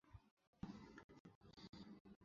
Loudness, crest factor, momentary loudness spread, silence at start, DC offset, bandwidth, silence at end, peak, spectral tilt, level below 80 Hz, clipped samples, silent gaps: -61 LUFS; 24 dB; 11 LU; 0.05 s; under 0.1%; 7.2 kHz; 0 s; -38 dBFS; -5.5 dB/octave; -74 dBFS; under 0.1%; 0.31-0.37 s, 0.47-0.53 s, 1.04-1.09 s, 1.20-1.25 s, 1.35-1.41 s, 2.00-2.05 s, 2.16-2.21 s